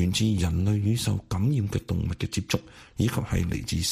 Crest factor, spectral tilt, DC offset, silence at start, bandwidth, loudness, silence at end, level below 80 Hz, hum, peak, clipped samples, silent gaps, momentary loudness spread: 18 dB; -5.5 dB/octave; under 0.1%; 0 s; 15.5 kHz; -27 LUFS; 0 s; -40 dBFS; none; -8 dBFS; under 0.1%; none; 6 LU